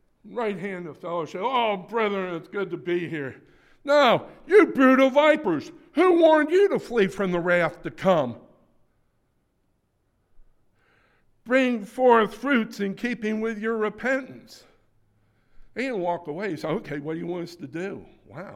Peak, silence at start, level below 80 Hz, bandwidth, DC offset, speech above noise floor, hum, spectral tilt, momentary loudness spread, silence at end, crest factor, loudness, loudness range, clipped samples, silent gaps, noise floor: -4 dBFS; 0.25 s; -60 dBFS; 14.5 kHz; under 0.1%; 47 dB; none; -6 dB/octave; 16 LU; 0 s; 20 dB; -23 LUFS; 12 LU; under 0.1%; none; -70 dBFS